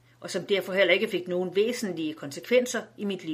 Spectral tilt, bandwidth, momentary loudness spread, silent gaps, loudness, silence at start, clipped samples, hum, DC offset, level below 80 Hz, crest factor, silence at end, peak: -4 dB/octave; 15.5 kHz; 11 LU; none; -27 LUFS; 0.2 s; under 0.1%; none; under 0.1%; -76 dBFS; 18 dB; 0 s; -8 dBFS